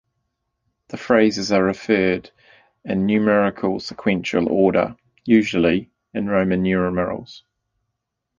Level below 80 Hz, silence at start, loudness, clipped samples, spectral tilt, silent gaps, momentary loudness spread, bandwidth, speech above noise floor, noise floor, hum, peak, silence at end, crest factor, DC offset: -50 dBFS; 0.95 s; -20 LUFS; under 0.1%; -6.5 dB/octave; none; 11 LU; 7.4 kHz; 59 dB; -78 dBFS; none; -2 dBFS; 1 s; 18 dB; under 0.1%